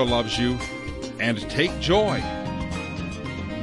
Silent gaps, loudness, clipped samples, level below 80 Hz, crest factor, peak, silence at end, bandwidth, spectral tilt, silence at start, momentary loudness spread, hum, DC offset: none; -25 LUFS; under 0.1%; -40 dBFS; 16 dB; -8 dBFS; 0 s; 11.5 kHz; -5 dB/octave; 0 s; 11 LU; none; under 0.1%